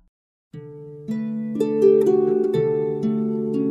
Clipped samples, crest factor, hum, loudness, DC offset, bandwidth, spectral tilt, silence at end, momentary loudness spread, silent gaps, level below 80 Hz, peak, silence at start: under 0.1%; 16 dB; none; -21 LUFS; under 0.1%; 8 kHz; -9 dB/octave; 0 s; 22 LU; none; -62 dBFS; -4 dBFS; 0.55 s